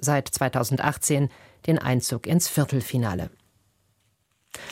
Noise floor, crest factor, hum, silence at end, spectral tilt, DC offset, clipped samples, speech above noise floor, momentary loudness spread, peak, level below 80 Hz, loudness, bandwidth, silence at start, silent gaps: -69 dBFS; 22 dB; none; 0 s; -5 dB/octave; under 0.1%; under 0.1%; 45 dB; 10 LU; -4 dBFS; -54 dBFS; -24 LUFS; 16.5 kHz; 0 s; none